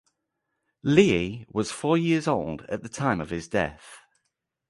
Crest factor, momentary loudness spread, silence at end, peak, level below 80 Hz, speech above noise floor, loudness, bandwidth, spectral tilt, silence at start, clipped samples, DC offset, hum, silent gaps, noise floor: 22 dB; 12 LU; 0.7 s; -6 dBFS; -52 dBFS; 55 dB; -25 LUFS; 11.5 kHz; -6 dB/octave; 0.85 s; under 0.1%; under 0.1%; none; none; -80 dBFS